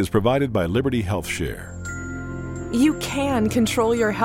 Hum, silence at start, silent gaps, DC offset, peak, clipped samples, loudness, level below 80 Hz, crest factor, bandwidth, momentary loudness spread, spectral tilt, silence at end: none; 0 s; none; under 0.1%; -6 dBFS; under 0.1%; -22 LUFS; -40 dBFS; 16 dB; 16.5 kHz; 11 LU; -5.5 dB/octave; 0 s